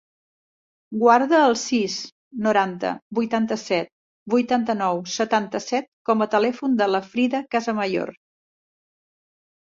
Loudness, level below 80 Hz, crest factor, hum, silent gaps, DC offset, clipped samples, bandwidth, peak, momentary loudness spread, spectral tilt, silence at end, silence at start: -22 LUFS; -68 dBFS; 20 dB; none; 2.12-2.31 s, 3.02-3.11 s, 3.92-4.26 s, 5.88-6.05 s; under 0.1%; under 0.1%; 7.8 kHz; -2 dBFS; 10 LU; -4.5 dB/octave; 1.5 s; 0.9 s